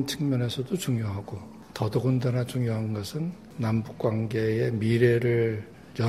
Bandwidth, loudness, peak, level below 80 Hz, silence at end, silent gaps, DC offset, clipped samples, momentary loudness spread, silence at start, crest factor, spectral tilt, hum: 14.5 kHz; -27 LUFS; -8 dBFS; -58 dBFS; 0 s; none; under 0.1%; under 0.1%; 13 LU; 0 s; 18 dB; -7 dB/octave; none